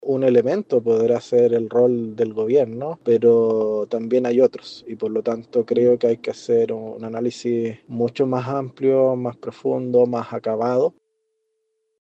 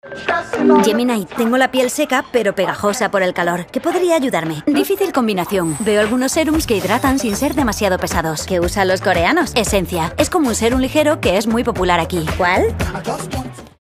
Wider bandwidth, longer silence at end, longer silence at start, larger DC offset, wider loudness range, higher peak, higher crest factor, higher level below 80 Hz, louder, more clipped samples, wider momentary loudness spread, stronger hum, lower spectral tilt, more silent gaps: second, 8 kHz vs 15.5 kHz; first, 1.1 s vs 0.15 s; about the same, 0 s vs 0.05 s; neither; about the same, 3 LU vs 1 LU; second, -4 dBFS vs 0 dBFS; about the same, 16 dB vs 16 dB; second, -70 dBFS vs -34 dBFS; second, -20 LUFS vs -16 LUFS; neither; first, 9 LU vs 5 LU; neither; first, -7.5 dB/octave vs -4.5 dB/octave; neither